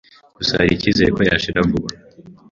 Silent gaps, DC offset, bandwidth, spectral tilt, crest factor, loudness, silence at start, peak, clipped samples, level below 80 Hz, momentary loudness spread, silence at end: none; under 0.1%; 7.6 kHz; -5.5 dB/octave; 18 dB; -17 LUFS; 0.4 s; -2 dBFS; under 0.1%; -38 dBFS; 7 LU; 0.2 s